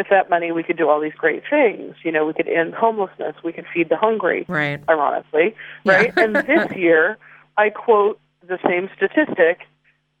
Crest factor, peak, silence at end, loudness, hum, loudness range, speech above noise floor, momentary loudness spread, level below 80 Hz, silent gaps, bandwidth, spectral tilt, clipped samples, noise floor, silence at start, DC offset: 16 dB; -2 dBFS; 0.55 s; -19 LUFS; none; 3 LU; 44 dB; 10 LU; -66 dBFS; none; 8.6 kHz; -6.5 dB/octave; under 0.1%; -62 dBFS; 0 s; under 0.1%